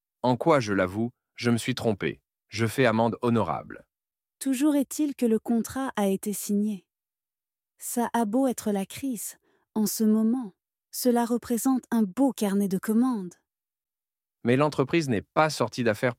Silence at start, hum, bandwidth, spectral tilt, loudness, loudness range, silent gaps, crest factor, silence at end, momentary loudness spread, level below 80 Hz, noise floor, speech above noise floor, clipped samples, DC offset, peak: 0.25 s; none; 16.5 kHz; -5.5 dB/octave; -26 LUFS; 3 LU; none; 20 dB; 0.05 s; 11 LU; -66 dBFS; under -90 dBFS; over 65 dB; under 0.1%; under 0.1%; -6 dBFS